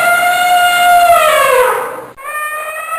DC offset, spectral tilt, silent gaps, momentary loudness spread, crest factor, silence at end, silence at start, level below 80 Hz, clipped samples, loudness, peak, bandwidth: under 0.1%; 0 dB/octave; none; 14 LU; 10 dB; 0 s; 0 s; -48 dBFS; under 0.1%; -10 LUFS; -2 dBFS; 16 kHz